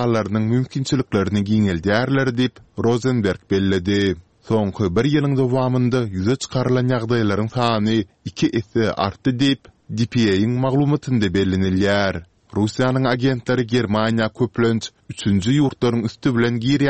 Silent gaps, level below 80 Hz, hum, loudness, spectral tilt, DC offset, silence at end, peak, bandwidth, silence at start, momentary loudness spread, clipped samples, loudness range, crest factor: none; -48 dBFS; none; -20 LUFS; -6.5 dB/octave; 0.3%; 0 s; -2 dBFS; 8.8 kHz; 0 s; 5 LU; under 0.1%; 1 LU; 16 dB